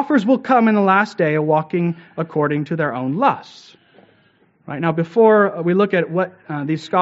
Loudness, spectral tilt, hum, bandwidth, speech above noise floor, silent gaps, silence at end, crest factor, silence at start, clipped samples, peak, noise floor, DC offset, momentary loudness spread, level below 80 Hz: -18 LUFS; -6 dB/octave; none; 8 kHz; 40 dB; none; 0 s; 16 dB; 0 s; under 0.1%; -2 dBFS; -57 dBFS; under 0.1%; 10 LU; -66 dBFS